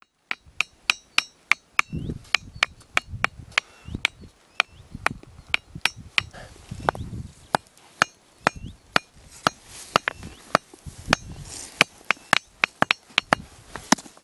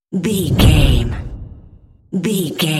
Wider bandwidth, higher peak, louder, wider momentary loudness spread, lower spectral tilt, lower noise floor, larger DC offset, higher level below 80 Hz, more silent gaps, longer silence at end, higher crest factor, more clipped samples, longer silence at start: first, over 20 kHz vs 16.5 kHz; about the same, 0 dBFS vs 0 dBFS; second, -25 LUFS vs -16 LUFS; about the same, 16 LU vs 17 LU; second, -2.5 dB/octave vs -5.5 dB/octave; first, -49 dBFS vs -44 dBFS; neither; second, -48 dBFS vs -22 dBFS; neither; first, 0.2 s vs 0 s; first, 28 dB vs 16 dB; neither; first, 0.3 s vs 0.1 s